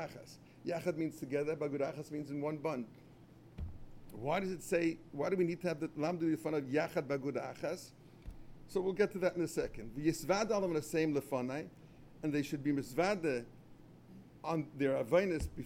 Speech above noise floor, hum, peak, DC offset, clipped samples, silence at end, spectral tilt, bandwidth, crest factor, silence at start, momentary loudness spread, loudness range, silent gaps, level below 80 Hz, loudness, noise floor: 22 dB; none; -18 dBFS; under 0.1%; under 0.1%; 0 s; -6 dB/octave; 16.5 kHz; 20 dB; 0 s; 17 LU; 4 LU; none; -58 dBFS; -37 LUFS; -58 dBFS